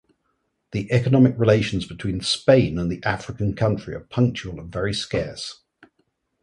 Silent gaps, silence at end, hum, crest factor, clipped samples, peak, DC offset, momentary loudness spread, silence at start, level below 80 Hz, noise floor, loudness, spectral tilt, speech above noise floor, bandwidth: none; 0.9 s; none; 20 dB; under 0.1%; -2 dBFS; under 0.1%; 14 LU; 0.7 s; -44 dBFS; -72 dBFS; -22 LUFS; -6.5 dB/octave; 51 dB; 11.5 kHz